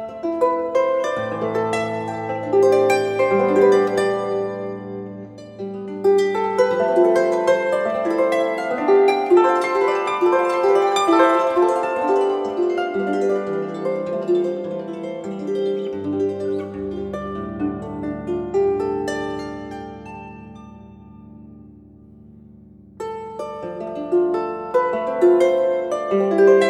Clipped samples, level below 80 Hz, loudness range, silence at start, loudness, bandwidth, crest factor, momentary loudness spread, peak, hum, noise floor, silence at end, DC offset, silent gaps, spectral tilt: under 0.1%; -54 dBFS; 11 LU; 0 s; -20 LUFS; 11.5 kHz; 16 dB; 15 LU; -2 dBFS; none; -45 dBFS; 0 s; under 0.1%; none; -6 dB/octave